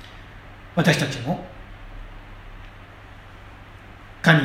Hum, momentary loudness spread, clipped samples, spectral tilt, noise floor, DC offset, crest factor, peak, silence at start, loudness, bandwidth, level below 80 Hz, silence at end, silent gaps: none; 24 LU; under 0.1%; -5.5 dB/octave; -43 dBFS; under 0.1%; 26 dB; 0 dBFS; 0 s; -22 LUFS; 15.5 kHz; -44 dBFS; 0 s; none